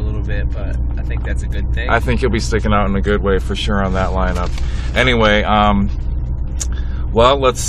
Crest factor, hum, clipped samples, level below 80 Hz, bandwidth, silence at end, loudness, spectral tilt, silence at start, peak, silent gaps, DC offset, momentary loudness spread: 16 dB; none; under 0.1%; -20 dBFS; 13 kHz; 0 s; -17 LUFS; -5.5 dB/octave; 0 s; 0 dBFS; none; under 0.1%; 10 LU